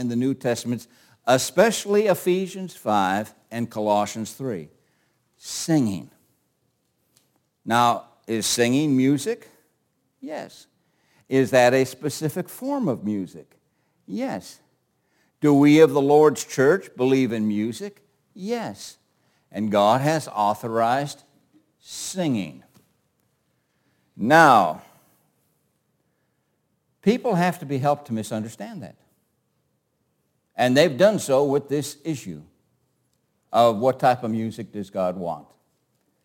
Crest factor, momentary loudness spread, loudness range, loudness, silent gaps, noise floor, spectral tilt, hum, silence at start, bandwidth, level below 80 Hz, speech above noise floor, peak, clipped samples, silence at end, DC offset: 22 dB; 18 LU; 8 LU; -22 LUFS; none; -71 dBFS; -5 dB/octave; none; 0 s; 17 kHz; -70 dBFS; 50 dB; -2 dBFS; under 0.1%; 0.85 s; under 0.1%